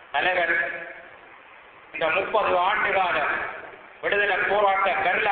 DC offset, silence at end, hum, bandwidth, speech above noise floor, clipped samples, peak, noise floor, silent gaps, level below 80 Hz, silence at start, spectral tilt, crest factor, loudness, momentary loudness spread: under 0.1%; 0 s; none; 4.6 kHz; 26 dB; under 0.1%; -8 dBFS; -48 dBFS; none; -58 dBFS; 0 s; -7.5 dB/octave; 16 dB; -23 LUFS; 16 LU